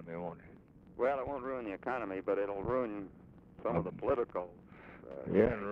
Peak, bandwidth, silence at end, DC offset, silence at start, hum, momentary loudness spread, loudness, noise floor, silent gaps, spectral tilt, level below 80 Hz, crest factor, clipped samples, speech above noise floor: -14 dBFS; 5.4 kHz; 0 s; under 0.1%; 0 s; none; 19 LU; -36 LUFS; -57 dBFS; none; -9.5 dB/octave; -58 dBFS; 22 dB; under 0.1%; 22 dB